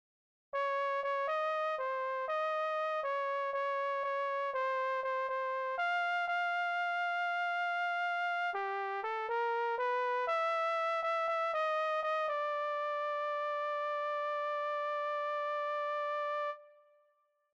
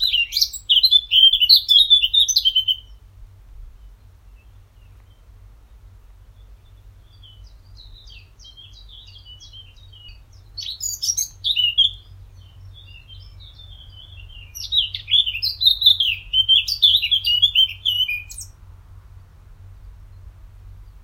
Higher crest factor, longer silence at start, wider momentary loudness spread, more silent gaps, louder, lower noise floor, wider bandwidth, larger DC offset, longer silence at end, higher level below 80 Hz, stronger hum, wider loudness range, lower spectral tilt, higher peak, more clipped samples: second, 10 dB vs 20 dB; first, 0.55 s vs 0 s; second, 3 LU vs 15 LU; neither; second, -34 LUFS vs -15 LUFS; first, -75 dBFS vs -47 dBFS; second, 8.8 kHz vs 16 kHz; neither; first, 0.85 s vs 0.15 s; second, -86 dBFS vs -44 dBFS; neither; second, 2 LU vs 14 LU; first, -0.5 dB/octave vs 2.5 dB/octave; second, -24 dBFS vs 0 dBFS; neither